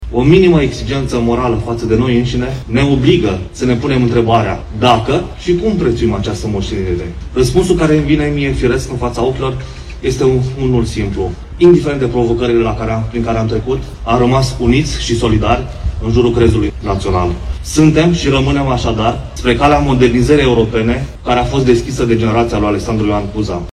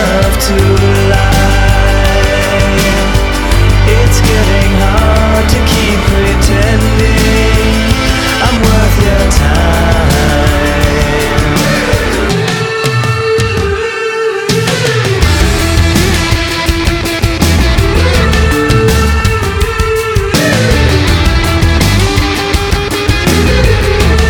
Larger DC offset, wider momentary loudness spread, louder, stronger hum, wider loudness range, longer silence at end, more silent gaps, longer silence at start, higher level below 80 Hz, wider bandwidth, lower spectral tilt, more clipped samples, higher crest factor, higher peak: neither; first, 8 LU vs 3 LU; second, -13 LUFS vs -10 LUFS; neither; about the same, 2 LU vs 2 LU; about the same, 0 s vs 0 s; neither; about the same, 0 s vs 0 s; second, -24 dBFS vs -14 dBFS; second, 12.5 kHz vs 19 kHz; first, -6.5 dB/octave vs -5 dB/octave; second, 0.3% vs 1%; about the same, 12 dB vs 8 dB; about the same, 0 dBFS vs 0 dBFS